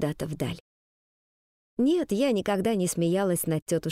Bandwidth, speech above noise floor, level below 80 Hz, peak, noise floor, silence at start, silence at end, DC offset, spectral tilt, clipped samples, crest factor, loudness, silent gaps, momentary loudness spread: 16 kHz; over 64 dB; -58 dBFS; -12 dBFS; under -90 dBFS; 0 s; 0 s; under 0.1%; -5.5 dB/octave; under 0.1%; 14 dB; -27 LUFS; 0.60-1.77 s, 3.62-3.66 s; 8 LU